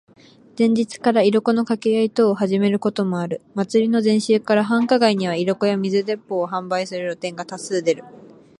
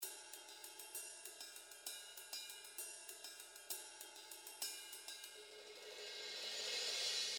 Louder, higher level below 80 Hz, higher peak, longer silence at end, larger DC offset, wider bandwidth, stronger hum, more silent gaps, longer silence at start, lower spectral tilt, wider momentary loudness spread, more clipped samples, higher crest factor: first, -20 LUFS vs -48 LUFS; first, -68 dBFS vs under -90 dBFS; first, -2 dBFS vs -30 dBFS; first, 0.35 s vs 0 s; neither; second, 11 kHz vs over 20 kHz; neither; neither; first, 0.55 s vs 0 s; first, -6 dB/octave vs 2.5 dB/octave; second, 9 LU vs 13 LU; neither; about the same, 16 dB vs 20 dB